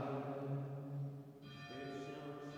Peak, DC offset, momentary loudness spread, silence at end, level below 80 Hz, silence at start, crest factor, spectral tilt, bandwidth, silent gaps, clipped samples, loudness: -30 dBFS; under 0.1%; 10 LU; 0 s; -80 dBFS; 0 s; 16 dB; -7.5 dB/octave; 16 kHz; none; under 0.1%; -47 LUFS